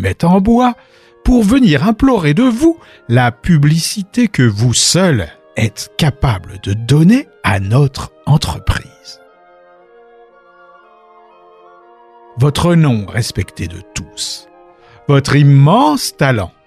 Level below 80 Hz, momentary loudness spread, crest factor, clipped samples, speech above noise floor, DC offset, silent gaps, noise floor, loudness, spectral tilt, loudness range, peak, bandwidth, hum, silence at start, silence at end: -32 dBFS; 13 LU; 12 dB; under 0.1%; 33 dB; under 0.1%; none; -44 dBFS; -13 LUFS; -5.5 dB/octave; 8 LU; 0 dBFS; 14.5 kHz; none; 0 s; 0.15 s